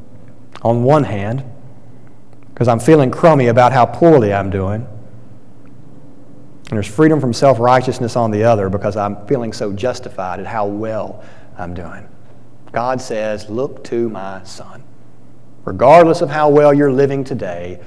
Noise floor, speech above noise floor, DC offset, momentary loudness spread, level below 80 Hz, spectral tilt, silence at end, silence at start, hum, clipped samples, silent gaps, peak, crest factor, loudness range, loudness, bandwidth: -44 dBFS; 31 dB; 3%; 18 LU; -50 dBFS; -7 dB/octave; 0.1 s; 0.55 s; none; under 0.1%; none; 0 dBFS; 16 dB; 11 LU; -14 LUFS; 11 kHz